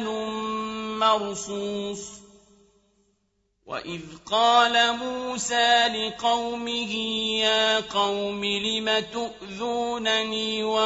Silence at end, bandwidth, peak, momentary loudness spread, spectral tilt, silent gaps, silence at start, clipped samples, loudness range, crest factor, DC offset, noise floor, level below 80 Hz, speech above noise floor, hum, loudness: 0 s; 8 kHz; -6 dBFS; 14 LU; -2 dB/octave; none; 0 s; under 0.1%; 7 LU; 20 dB; under 0.1%; -72 dBFS; -60 dBFS; 47 dB; none; -24 LUFS